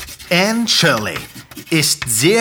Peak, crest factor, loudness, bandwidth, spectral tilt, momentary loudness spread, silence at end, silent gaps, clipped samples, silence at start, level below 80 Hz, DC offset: 0 dBFS; 16 dB; -15 LUFS; over 20 kHz; -3 dB/octave; 15 LU; 0 s; none; under 0.1%; 0 s; -48 dBFS; under 0.1%